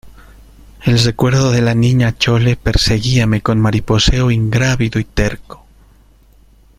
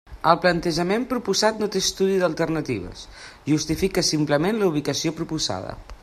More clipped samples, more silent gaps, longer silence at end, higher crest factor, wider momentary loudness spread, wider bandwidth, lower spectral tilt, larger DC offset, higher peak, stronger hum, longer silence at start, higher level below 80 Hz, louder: neither; neither; first, 1.25 s vs 0.1 s; second, 14 dB vs 22 dB; second, 5 LU vs 11 LU; about the same, 14.5 kHz vs 14.5 kHz; first, -5.5 dB/octave vs -4 dB/octave; neither; about the same, 0 dBFS vs -2 dBFS; neither; about the same, 0.05 s vs 0.05 s; first, -26 dBFS vs -46 dBFS; first, -14 LUFS vs -22 LUFS